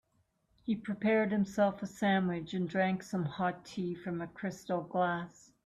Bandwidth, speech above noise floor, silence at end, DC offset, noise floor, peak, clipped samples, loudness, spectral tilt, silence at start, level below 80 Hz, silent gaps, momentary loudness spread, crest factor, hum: 13 kHz; 42 dB; 0.35 s; under 0.1%; -75 dBFS; -18 dBFS; under 0.1%; -34 LUFS; -6.5 dB/octave; 0.65 s; -70 dBFS; none; 10 LU; 16 dB; none